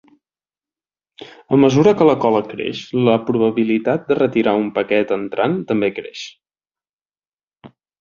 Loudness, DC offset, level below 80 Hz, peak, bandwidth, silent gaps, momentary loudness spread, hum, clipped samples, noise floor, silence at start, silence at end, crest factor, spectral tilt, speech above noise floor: -17 LUFS; under 0.1%; -56 dBFS; -2 dBFS; 7.2 kHz; 6.93-6.99 s, 7.33-7.37 s; 12 LU; none; under 0.1%; under -90 dBFS; 1.2 s; 0.35 s; 16 dB; -7 dB/octave; over 74 dB